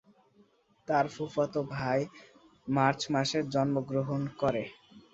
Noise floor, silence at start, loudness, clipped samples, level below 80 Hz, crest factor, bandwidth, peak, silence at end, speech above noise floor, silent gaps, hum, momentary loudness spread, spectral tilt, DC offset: -65 dBFS; 0.9 s; -31 LUFS; under 0.1%; -64 dBFS; 22 dB; 8 kHz; -10 dBFS; 0.15 s; 35 dB; none; none; 9 LU; -6 dB/octave; under 0.1%